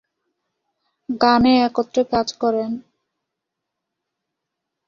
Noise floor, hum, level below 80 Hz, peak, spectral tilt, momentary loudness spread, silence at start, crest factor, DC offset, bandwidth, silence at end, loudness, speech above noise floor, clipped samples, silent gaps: -81 dBFS; none; -52 dBFS; -2 dBFS; -5 dB/octave; 14 LU; 1.1 s; 20 dB; under 0.1%; 7.4 kHz; 2.1 s; -18 LUFS; 64 dB; under 0.1%; none